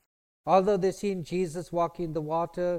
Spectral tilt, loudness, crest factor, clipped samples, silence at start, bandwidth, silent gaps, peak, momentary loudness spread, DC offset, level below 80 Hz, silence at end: -6.5 dB/octave; -28 LUFS; 18 dB; under 0.1%; 0.45 s; 15 kHz; none; -10 dBFS; 9 LU; under 0.1%; -56 dBFS; 0 s